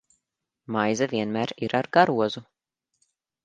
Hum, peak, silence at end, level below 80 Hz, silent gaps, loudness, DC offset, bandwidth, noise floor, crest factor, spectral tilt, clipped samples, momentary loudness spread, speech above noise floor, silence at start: none; -4 dBFS; 1 s; -68 dBFS; none; -24 LUFS; under 0.1%; 9.2 kHz; -82 dBFS; 22 dB; -5 dB/octave; under 0.1%; 9 LU; 58 dB; 0.7 s